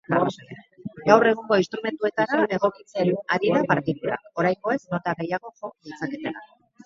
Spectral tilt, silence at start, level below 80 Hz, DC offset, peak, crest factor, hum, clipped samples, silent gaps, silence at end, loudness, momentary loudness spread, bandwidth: -6.5 dB/octave; 0.1 s; -64 dBFS; under 0.1%; 0 dBFS; 24 dB; none; under 0.1%; none; 0.4 s; -24 LUFS; 19 LU; 7.6 kHz